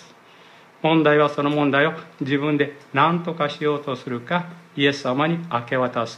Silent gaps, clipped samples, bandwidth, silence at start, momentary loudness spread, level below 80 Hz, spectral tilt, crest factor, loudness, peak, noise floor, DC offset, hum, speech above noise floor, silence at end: none; under 0.1%; 8.8 kHz; 0 s; 8 LU; -72 dBFS; -6.5 dB/octave; 18 dB; -21 LUFS; -4 dBFS; -49 dBFS; under 0.1%; none; 27 dB; 0 s